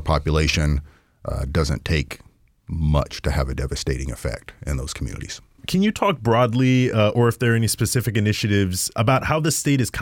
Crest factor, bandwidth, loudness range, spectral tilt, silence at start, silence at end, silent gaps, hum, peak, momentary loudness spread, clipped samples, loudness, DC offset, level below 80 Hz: 16 dB; 18 kHz; 7 LU; -5 dB/octave; 0 s; 0 s; none; none; -6 dBFS; 12 LU; under 0.1%; -21 LUFS; under 0.1%; -32 dBFS